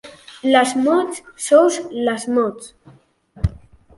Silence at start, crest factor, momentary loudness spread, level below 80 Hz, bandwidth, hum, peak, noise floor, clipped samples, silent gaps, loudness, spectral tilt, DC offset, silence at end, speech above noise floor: 0.05 s; 18 dB; 13 LU; -38 dBFS; 11.5 kHz; none; -2 dBFS; -47 dBFS; under 0.1%; none; -18 LUFS; -5 dB/octave; under 0.1%; 0.4 s; 30 dB